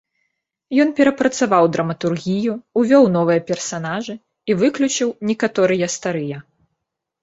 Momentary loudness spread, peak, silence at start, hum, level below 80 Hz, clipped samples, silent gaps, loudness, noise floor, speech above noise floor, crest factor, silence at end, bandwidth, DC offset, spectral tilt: 11 LU; -2 dBFS; 0.7 s; none; -62 dBFS; under 0.1%; none; -18 LUFS; -78 dBFS; 60 dB; 16 dB; 0.8 s; 8 kHz; under 0.1%; -5 dB/octave